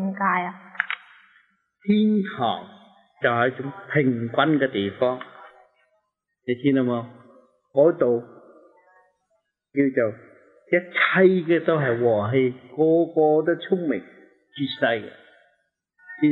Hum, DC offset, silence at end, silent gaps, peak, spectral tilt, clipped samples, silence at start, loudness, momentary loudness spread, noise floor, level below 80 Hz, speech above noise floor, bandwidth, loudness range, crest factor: none; under 0.1%; 0 s; none; -4 dBFS; -9.5 dB/octave; under 0.1%; 0 s; -22 LUFS; 13 LU; -74 dBFS; -72 dBFS; 52 dB; 4.3 kHz; 5 LU; 20 dB